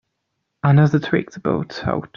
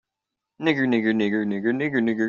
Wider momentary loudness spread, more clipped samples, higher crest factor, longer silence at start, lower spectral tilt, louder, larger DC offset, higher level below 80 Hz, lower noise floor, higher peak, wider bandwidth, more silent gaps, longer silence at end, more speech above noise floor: first, 9 LU vs 3 LU; neither; about the same, 16 dB vs 16 dB; about the same, 0.65 s vs 0.6 s; first, -8.5 dB/octave vs -5 dB/octave; first, -19 LUFS vs -23 LUFS; neither; first, -52 dBFS vs -68 dBFS; second, -75 dBFS vs -85 dBFS; first, -4 dBFS vs -8 dBFS; about the same, 6.8 kHz vs 7 kHz; neither; about the same, 0.1 s vs 0 s; second, 57 dB vs 63 dB